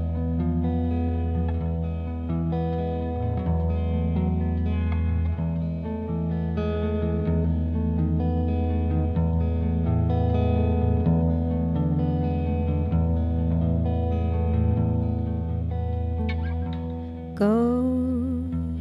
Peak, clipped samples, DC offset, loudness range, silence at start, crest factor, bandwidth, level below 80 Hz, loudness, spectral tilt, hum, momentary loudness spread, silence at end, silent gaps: -10 dBFS; under 0.1%; under 0.1%; 3 LU; 0 s; 14 dB; 4.5 kHz; -30 dBFS; -25 LUFS; -11 dB/octave; none; 5 LU; 0 s; none